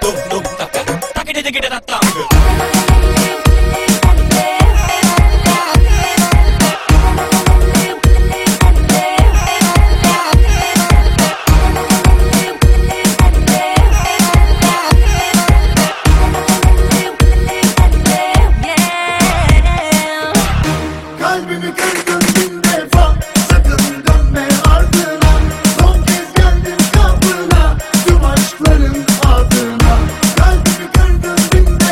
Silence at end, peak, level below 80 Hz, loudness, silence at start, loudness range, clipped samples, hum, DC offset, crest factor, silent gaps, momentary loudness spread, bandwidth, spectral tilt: 0 s; 0 dBFS; -12 dBFS; -12 LUFS; 0 s; 2 LU; 0.3%; none; under 0.1%; 10 dB; none; 4 LU; 16.5 kHz; -4.5 dB/octave